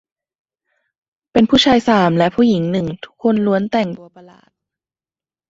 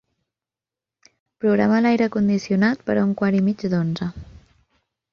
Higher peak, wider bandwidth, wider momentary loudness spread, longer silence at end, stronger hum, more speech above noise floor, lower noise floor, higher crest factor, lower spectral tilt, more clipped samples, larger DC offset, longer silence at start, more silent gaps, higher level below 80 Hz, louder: first, 0 dBFS vs -6 dBFS; first, 7.8 kHz vs 6.8 kHz; about the same, 10 LU vs 8 LU; first, 1.45 s vs 0.9 s; neither; first, over 75 dB vs 70 dB; about the same, under -90 dBFS vs -89 dBFS; about the same, 16 dB vs 16 dB; second, -6 dB/octave vs -7.5 dB/octave; neither; neither; about the same, 1.35 s vs 1.45 s; neither; about the same, -50 dBFS vs -52 dBFS; first, -15 LUFS vs -20 LUFS